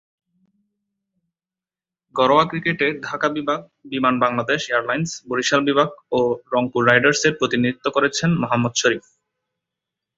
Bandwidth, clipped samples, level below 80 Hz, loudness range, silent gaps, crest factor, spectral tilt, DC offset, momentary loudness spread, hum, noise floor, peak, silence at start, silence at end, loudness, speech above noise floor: 8 kHz; under 0.1%; -58 dBFS; 4 LU; none; 20 dB; -4.5 dB/octave; under 0.1%; 8 LU; none; under -90 dBFS; 0 dBFS; 2.15 s; 1.2 s; -20 LUFS; over 70 dB